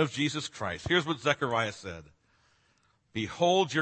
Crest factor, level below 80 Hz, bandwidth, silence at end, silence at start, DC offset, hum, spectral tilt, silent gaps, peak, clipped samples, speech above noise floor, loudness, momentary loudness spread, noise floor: 22 dB; -60 dBFS; 8.8 kHz; 0 s; 0 s; under 0.1%; none; -4.5 dB/octave; none; -10 dBFS; under 0.1%; 40 dB; -29 LUFS; 15 LU; -70 dBFS